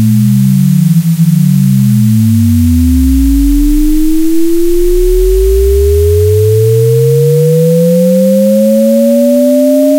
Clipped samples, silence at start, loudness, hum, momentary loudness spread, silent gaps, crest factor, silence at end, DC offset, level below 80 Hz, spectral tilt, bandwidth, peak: under 0.1%; 0 s; -8 LUFS; none; 3 LU; none; 6 dB; 0 s; under 0.1%; -16 dBFS; -8 dB/octave; 17 kHz; 0 dBFS